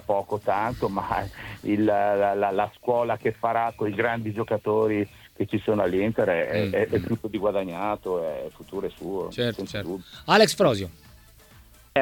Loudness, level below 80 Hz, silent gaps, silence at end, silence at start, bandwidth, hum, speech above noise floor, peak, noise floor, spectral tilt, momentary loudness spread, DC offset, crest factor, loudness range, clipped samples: -25 LUFS; -54 dBFS; none; 0 s; 0.1 s; 19 kHz; none; 27 dB; -4 dBFS; -52 dBFS; -5.5 dB/octave; 11 LU; under 0.1%; 20 dB; 3 LU; under 0.1%